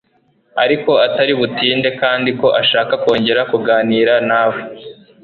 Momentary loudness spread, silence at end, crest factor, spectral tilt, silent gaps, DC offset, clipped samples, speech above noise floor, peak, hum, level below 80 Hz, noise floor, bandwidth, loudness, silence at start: 5 LU; 0.3 s; 14 dB; -6.5 dB/octave; none; under 0.1%; under 0.1%; 44 dB; 0 dBFS; none; -56 dBFS; -58 dBFS; 6.4 kHz; -14 LUFS; 0.55 s